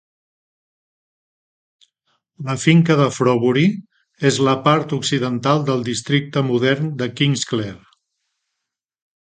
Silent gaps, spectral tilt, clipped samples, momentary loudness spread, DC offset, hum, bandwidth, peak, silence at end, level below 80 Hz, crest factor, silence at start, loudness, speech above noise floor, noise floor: none; -5.5 dB/octave; under 0.1%; 9 LU; under 0.1%; none; 9.4 kHz; 0 dBFS; 1.6 s; -58 dBFS; 20 dB; 2.4 s; -18 LUFS; 64 dB; -81 dBFS